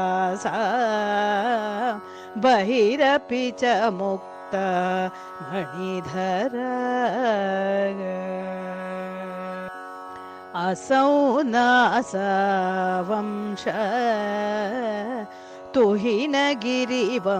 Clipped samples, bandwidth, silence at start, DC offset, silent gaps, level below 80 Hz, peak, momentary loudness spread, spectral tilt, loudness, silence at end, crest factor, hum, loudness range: under 0.1%; 13.5 kHz; 0 s; under 0.1%; none; -66 dBFS; -10 dBFS; 13 LU; -5 dB/octave; -23 LUFS; 0 s; 14 dB; none; 5 LU